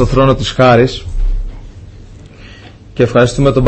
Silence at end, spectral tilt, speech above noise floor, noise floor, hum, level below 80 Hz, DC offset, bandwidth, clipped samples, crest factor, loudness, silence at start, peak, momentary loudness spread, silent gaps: 0 s; -6.5 dB/octave; 25 dB; -35 dBFS; none; -22 dBFS; under 0.1%; 8.6 kHz; under 0.1%; 12 dB; -12 LUFS; 0 s; 0 dBFS; 16 LU; none